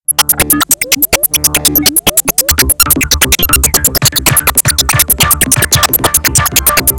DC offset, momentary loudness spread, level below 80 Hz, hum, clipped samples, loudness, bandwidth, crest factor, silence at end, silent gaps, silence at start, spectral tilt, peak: under 0.1%; 2 LU; -24 dBFS; none; 2%; -8 LUFS; over 20 kHz; 10 dB; 0 s; none; 0.1 s; -1.5 dB/octave; 0 dBFS